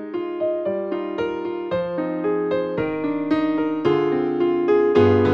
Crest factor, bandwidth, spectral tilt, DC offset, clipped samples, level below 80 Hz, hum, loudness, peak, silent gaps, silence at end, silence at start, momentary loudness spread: 16 dB; 6.4 kHz; -8.5 dB/octave; under 0.1%; under 0.1%; -56 dBFS; none; -22 LUFS; -4 dBFS; none; 0 s; 0 s; 9 LU